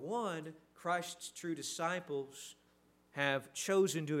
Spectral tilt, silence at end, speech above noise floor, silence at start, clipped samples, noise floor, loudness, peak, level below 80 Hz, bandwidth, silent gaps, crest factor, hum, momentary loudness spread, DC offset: -4 dB/octave; 0 s; 33 dB; 0 s; under 0.1%; -70 dBFS; -38 LUFS; -18 dBFS; -82 dBFS; 16 kHz; none; 22 dB; none; 16 LU; under 0.1%